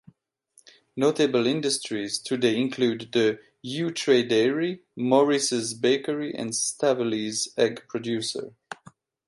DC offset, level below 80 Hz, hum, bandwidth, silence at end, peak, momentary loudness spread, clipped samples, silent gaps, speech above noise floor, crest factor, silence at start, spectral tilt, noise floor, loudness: under 0.1%; -74 dBFS; none; 11.5 kHz; 0.55 s; -6 dBFS; 11 LU; under 0.1%; none; 38 dB; 18 dB; 0.95 s; -3.5 dB/octave; -63 dBFS; -25 LUFS